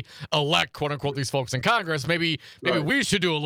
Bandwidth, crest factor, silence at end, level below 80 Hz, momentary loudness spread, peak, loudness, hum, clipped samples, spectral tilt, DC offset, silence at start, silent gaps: 18 kHz; 20 dB; 0 s; -58 dBFS; 6 LU; -6 dBFS; -24 LUFS; none; under 0.1%; -4 dB/octave; under 0.1%; 0 s; none